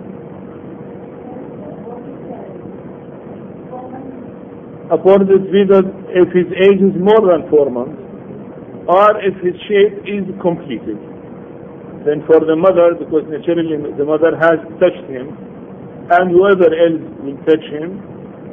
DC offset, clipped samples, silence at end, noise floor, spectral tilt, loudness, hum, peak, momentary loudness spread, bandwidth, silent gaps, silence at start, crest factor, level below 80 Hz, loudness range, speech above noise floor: under 0.1%; under 0.1%; 0 s; -32 dBFS; -9 dB/octave; -13 LUFS; none; 0 dBFS; 22 LU; 3.7 kHz; none; 0 s; 14 dB; -54 dBFS; 18 LU; 19 dB